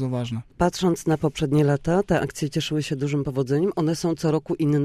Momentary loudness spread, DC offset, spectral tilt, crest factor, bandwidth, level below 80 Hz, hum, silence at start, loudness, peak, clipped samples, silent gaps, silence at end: 5 LU; under 0.1%; -6.5 dB/octave; 14 dB; 14.5 kHz; -46 dBFS; none; 0 s; -24 LUFS; -8 dBFS; under 0.1%; none; 0 s